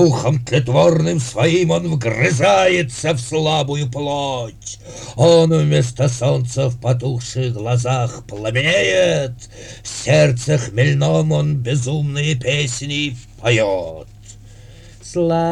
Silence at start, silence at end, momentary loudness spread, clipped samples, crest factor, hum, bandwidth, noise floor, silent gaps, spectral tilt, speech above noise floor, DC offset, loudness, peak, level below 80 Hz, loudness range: 0 s; 0 s; 12 LU; under 0.1%; 16 dB; none; 11 kHz; -40 dBFS; none; -5.5 dB/octave; 23 dB; under 0.1%; -17 LUFS; -2 dBFS; -44 dBFS; 3 LU